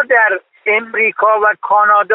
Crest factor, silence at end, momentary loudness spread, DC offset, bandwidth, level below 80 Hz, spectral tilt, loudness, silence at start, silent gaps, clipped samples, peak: 12 dB; 0 s; 5 LU; under 0.1%; 4 kHz; -64 dBFS; -6 dB/octave; -12 LUFS; 0 s; none; under 0.1%; 0 dBFS